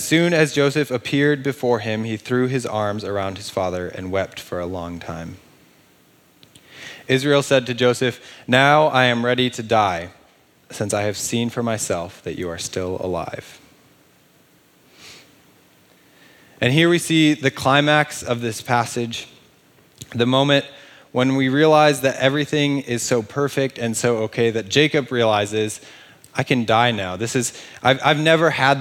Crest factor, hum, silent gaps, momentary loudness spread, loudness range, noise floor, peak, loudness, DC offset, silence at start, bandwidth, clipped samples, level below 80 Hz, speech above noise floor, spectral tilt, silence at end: 20 dB; none; none; 13 LU; 10 LU; -55 dBFS; -2 dBFS; -19 LUFS; under 0.1%; 0 s; 18 kHz; under 0.1%; -62 dBFS; 36 dB; -4.5 dB/octave; 0 s